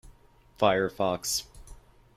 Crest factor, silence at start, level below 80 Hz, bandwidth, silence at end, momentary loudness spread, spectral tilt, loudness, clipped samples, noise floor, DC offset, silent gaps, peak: 24 dB; 0.05 s; -54 dBFS; 16 kHz; 0.45 s; 7 LU; -3 dB/octave; -27 LUFS; under 0.1%; -58 dBFS; under 0.1%; none; -8 dBFS